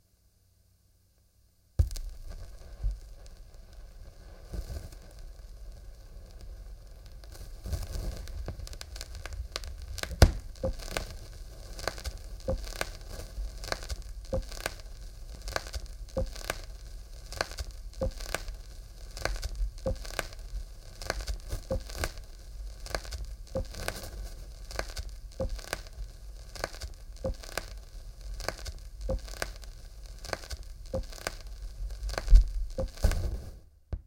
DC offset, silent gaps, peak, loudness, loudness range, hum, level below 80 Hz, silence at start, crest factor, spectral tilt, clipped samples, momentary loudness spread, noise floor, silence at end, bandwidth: under 0.1%; none; -6 dBFS; -37 LUFS; 12 LU; none; -36 dBFS; 1.8 s; 28 dB; -4.5 dB/octave; under 0.1%; 15 LU; -66 dBFS; 0 s; 17 kHz